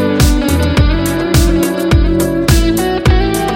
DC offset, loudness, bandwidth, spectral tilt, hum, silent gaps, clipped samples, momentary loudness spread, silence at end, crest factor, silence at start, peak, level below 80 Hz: under 0.1%; -12 LUFS; 17 kHz; -5.5 dB/octave; none; none; under 0.1%; 2 LU; 0 s; 10 dB; 0 s; 0 dBFS; -16 dBFS